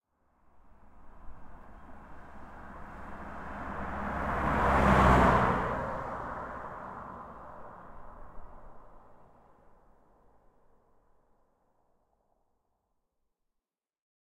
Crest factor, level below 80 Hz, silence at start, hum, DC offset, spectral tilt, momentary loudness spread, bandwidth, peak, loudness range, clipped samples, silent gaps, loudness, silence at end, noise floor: 24 dB; -42 dBFS; 0.55 s; none; under 0.1%; -7 dB/octave; 29 LU; 14 kHz; -10 dBFS; 22 LU; under 0.1%; none; -29 LUFS; 5.15 s; -88 dBFS